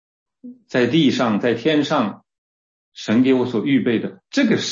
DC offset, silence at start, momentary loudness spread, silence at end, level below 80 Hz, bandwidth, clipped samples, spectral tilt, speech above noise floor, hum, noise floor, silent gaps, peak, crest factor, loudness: under 0.1%; 0.45 s; 8 LU; 0 s; -64 dBFS; 7.6 kHz; under 0.1%; -5.5 dB/octave; over 72 dB; none; under -90 dBFS; 2.38-2.92 s; -4 dBFS; 14 dB; -19 LUFS